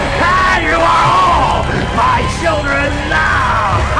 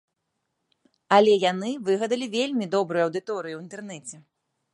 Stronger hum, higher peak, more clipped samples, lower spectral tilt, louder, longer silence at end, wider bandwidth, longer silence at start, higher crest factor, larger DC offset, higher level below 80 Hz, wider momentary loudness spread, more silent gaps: neither; about the same, -4 dBFS vs -4 dBFS; neither; about the same, -5 dB/octave vs -4.5 dB/octave; first, -12 LUFS vs -24 LUFS; second, 0 s vs 0.55 s; about the same, 10.5 kHz vs 11.5 kHz; second, 0 s vs 1.1 s; second, 8 dB vs 22 dB; first, 0.9% vs under 0.1%; first, -24 dBFS vs -78 dBFS; second, 5 LU vs 19 LU; neither